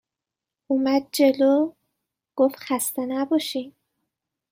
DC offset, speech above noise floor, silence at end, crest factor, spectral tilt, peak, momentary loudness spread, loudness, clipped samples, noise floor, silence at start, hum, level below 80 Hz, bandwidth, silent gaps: under 0.1%; 66 dB; 0.8 s; 18 dB; -3 dB/octave; -8 dBFS; 11 LU; -23 LUFS; under 0.1%; -87 dBFS; 0.7 s; none; -74 dBFS; 16.5 kHz; none